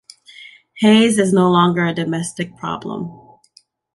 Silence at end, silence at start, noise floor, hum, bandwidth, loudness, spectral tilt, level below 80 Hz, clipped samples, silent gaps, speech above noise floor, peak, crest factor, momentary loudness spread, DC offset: 0.8 s; 0.4 s; -54 dBFS; none; 11.5 kHz; -16 LUFS; -5.5 dB/octave; -58 dBFS; under 0.1%; none; 38 dB; -2 dBFS; 16 dB; 14 LU; under 0.1%